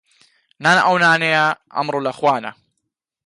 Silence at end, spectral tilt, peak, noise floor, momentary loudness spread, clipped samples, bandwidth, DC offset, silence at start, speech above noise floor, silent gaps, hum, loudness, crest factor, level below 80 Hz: 0.75 s; -4 dB/octave; -4 dBFS; -77 dBFS; 10 LU; under 0.1%; 11.5 kHz; under 0.1%; 0.6 s; 60 dB; none; none; -16 LUFS; 16 dB; -68 dBFS